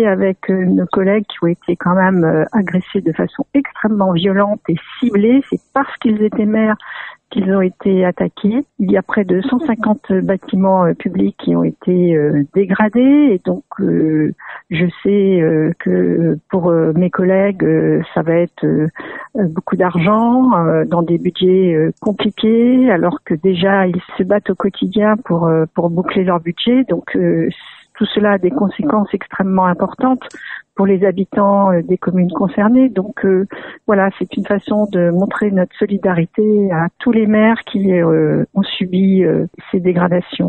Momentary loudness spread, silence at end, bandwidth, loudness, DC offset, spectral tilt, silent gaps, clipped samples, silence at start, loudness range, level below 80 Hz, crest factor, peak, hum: 6 LU; 0 s; 4.2 kHz; -15 LUFS; under 0.1%; -9.5 dB/octave; none; under 0.1%; 0 s; 2 LU; -52 dBFS; 14 dB; 0 dBFS; none